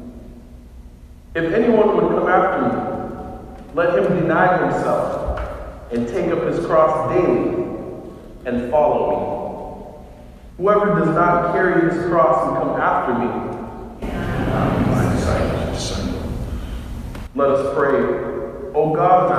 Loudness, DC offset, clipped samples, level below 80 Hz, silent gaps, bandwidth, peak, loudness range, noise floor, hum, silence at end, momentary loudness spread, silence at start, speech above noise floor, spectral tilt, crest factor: -19 LUFS; under 0.1%; under 0.1%; -34 dBFS; none; 14.5 kHz; -2 dBFS; 4 LU; -40 dBFS; none; 0 s; 15 LU; 0 s; 23 dB; -7 dB/octave; 18 dB